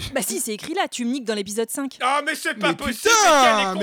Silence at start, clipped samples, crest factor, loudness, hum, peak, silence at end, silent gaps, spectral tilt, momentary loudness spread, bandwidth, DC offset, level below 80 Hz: 0 s; under 0.1%; 14 dB; -20 LUFS; none; -6 dBFS; 0 s; none; -2 dB/octave; 11 LU; over 20 kHz; under 0.1%; -52 dBFS